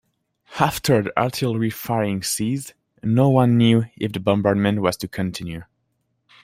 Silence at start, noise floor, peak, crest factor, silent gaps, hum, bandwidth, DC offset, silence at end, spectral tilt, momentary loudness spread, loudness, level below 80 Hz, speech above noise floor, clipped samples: 0.5 s; -71 dBFS; -2 dBFS; 18 dB; none; none; 16 kHz; under 0.1%; 0.8 s; -6 dB/octave; 14 LU; -20 LUFS; -54 dBFS; 51 dB; under 0.1%